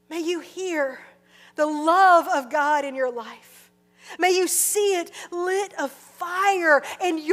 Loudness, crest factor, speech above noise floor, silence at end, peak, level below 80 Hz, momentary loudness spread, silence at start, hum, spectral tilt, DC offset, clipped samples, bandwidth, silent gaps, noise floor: -22 LUFS; 18 dB; 32 dB; 0 s; -6 dBFS; -80 dBFS; 15 LU; 0.1 s; 60 Hz at -65 dBFS; -0.5 dB/octave; under 0.1%; under 0.1%; 16 kHz; none; -54 dBFS